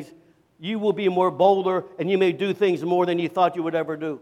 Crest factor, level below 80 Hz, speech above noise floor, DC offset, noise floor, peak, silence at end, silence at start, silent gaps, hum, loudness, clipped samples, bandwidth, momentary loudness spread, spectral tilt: 16 dB; -74 dBFS; 32 dB; under 0.1%; -54 dBFS; -6 dBFS; 0.05 s; 0 s; none; none; -22 LUFS; under 0.1%; 9 kHz; 7 LU; -7 dB/octave